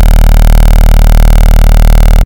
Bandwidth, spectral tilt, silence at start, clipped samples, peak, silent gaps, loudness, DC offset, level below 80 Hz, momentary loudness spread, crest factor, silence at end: 17 kHz; -6 dB/octave; 0 s; 5%; 0 dBFS; none; -8 LUFS; under 0.1%; -2 dBFS; 0 LU; 2 dB; 0 s